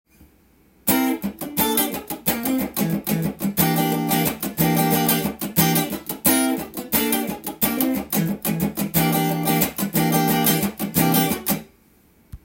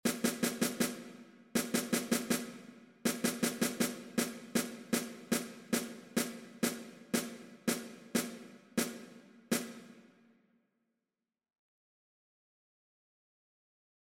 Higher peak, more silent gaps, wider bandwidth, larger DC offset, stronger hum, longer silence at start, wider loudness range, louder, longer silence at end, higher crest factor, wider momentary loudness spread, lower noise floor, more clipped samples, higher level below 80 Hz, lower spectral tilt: first, -2 dBFS vs -18 dBFS; neither; about the same, 17 kHz vs 16.5 kHz; neither; neither; first, 0.85 s vs 0.05 s; second, 2 LU vs 7 LU; first, -21 LUFS vs -36 LUFS; second, 0.05 s vs 4 s; about the same, 20 dB vs 20 dB; second, 6 LU vs 14 LU; second, -56 dBFS vs under -90 dBFS; neither; first, -50 dBFS vs -76 dBFS; first, -4.5 dB/octave vs -3 dB/octave